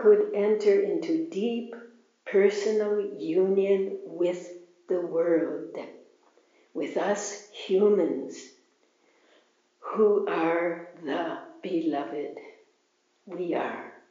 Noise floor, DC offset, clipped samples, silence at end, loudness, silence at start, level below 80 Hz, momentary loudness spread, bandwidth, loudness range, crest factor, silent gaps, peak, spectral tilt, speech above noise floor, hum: -70 dBFS; under 0.1%; under 0.1%; 0.15 s; -27 LUFS; 0 s; under -90 dBFS; 17 LU; 7.4 kHz; 5 LU; 18 dB; none; -10 dBFS; -5 dB/octave; 44 dB; none